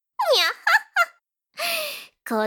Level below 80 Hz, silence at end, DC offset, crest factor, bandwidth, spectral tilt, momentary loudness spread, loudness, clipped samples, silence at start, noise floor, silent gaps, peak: -86 dBFS; 0 s; under 0.1%; 18 dB; 19.5 kHz; -1 dB/octave; 10 LU; -22 LUFS; under 0.1%; 0.2 s; -56 dBFS; none; -6 dBFS